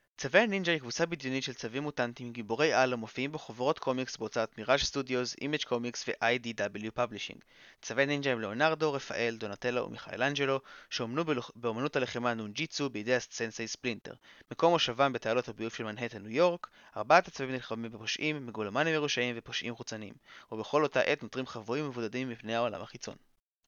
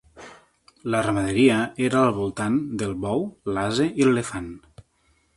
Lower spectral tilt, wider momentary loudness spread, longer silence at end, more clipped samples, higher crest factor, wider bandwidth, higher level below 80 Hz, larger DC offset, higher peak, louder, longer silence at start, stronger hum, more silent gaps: second, -4 dB/octave vs -5.5 dB/octave; about the same, 12 LU vs 10 LU; second, 0.5 s vs 0.8 s; neither; first, 24 dB vs 18 dB; second, 7.4 kHz vs 11.5 kHz; second, -66 dBFS vs -52 dBFS; neither; about the same, -8 dBFS vs -6 dBFS; second, -32 LUFS vs -23 LUFS; about the same, 0.2 s vs 0.15 s; neither; neither